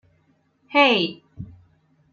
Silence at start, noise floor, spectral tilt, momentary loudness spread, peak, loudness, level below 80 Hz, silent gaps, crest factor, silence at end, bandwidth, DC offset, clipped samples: 0.7 s; -64 dBFS; -5 dB/octave; 25 LU; -4 dBFS; -19 LUFS; -60 dBFS; none; 20 dB; 0.65 s; 7 kHz; under 0.1%; under 0.1%